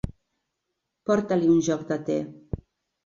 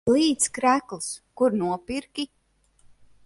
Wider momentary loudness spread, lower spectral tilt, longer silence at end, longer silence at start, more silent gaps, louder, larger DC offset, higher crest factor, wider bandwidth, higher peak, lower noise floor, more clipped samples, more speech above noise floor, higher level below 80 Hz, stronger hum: first, 17 LU vs 13 LU; first, -6.5 dB/octave vs -3.5 dB/octave; second, 0.5 s vs 1 s; about the same, 0.05 s vs 0.05 s; neither; about the same, -25 LUFS vs -25 LUFS; neither; about the same, 16 dB vs 18 dB; second, 7.4 kHz vs 11.5 kHz; about the same, -10 dBFS vs -8 dBFS; first, -81 dBFS vs -60 dBFS; neither; first, 58 dB vs 36 dB; first, -48 dBFS vs -60 dBFS; neither